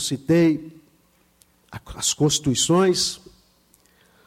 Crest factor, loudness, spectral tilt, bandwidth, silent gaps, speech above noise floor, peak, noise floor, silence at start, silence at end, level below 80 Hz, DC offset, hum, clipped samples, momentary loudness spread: 14 dB; -20 LUFS; -4 dB/octave; 16 kHz; none; 40 dB; -8 dBFS; -61 dBFS; 0 s; 1.1 s; -52 dBFS; under 0.1%; none; under 0.1%; 21 LU